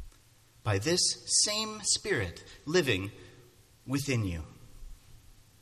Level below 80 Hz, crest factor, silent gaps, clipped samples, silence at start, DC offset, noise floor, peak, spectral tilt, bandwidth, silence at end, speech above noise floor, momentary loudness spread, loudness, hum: -52 dBFS; 20 dB; none; under 0.1%; 0 s; under 0.1%; -61 dBFS; -14 dBFS; -3 dB/octave; 14.5 kHz; 0.3 s; 31 dB; 15 LU; -29 LUFS; none